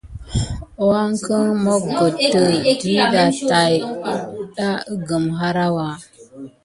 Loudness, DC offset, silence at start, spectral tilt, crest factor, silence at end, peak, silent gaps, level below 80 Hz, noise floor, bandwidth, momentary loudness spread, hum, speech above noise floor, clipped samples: -18 LUFS; under 0.1%; 0.05 s; -5 dB/octave; 18 dB; 0.15 s; 0 dBFS; none; -40 dBFS; -38 dBFS; 11.5 kHz; 11 LU; none; 21 dB; under 0.1%